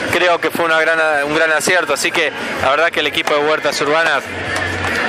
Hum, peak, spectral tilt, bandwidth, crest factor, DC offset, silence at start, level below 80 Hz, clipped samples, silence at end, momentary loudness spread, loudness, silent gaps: none; 0 dBFS; -2.5 dB/octave; 15.5 kHz; 14 dB; under 0.1%; 0 s; -50 dBFS; under 0.1%; 0 s; 5 LU; -15 LUFS; none